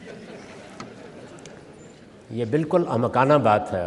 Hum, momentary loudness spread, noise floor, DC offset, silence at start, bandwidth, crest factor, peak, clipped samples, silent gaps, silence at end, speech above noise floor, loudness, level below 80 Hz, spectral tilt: none; 24 LU; -46 dBFS; under 0.1%; 0 s; 11.5 kHz; 20 dB; -4 dBFS; under 0.1%; none; 0 s; 26 dB; -21 LUFS; -62 dBFS; -7.5 dB/octave